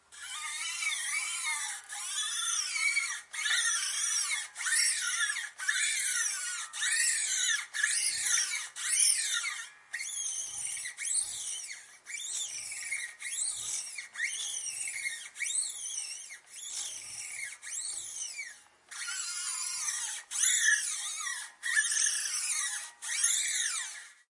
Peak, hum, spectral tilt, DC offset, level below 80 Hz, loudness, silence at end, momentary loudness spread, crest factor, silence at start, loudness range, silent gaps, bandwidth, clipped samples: -14 dBFS; none; 5.5 dB/octave; under 0.1%; -82 dBFS; -30 LUFS; 0.2 s; 12 LU; 20 dB; 0.1 s; 7 LU; none; 11.5 kHz; under 0.1%